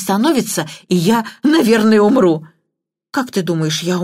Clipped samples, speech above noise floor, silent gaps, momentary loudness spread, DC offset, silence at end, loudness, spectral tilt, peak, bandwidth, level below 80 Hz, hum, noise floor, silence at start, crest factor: under 0.1%; 62 dB; none; 11 LU; under 0.1%; 0 s; -15 LUFS; -5 dB/octave; 0 dBFS; 16 kHz; -58 dBFS; none; -76 dBFS; 0 s; 14 dB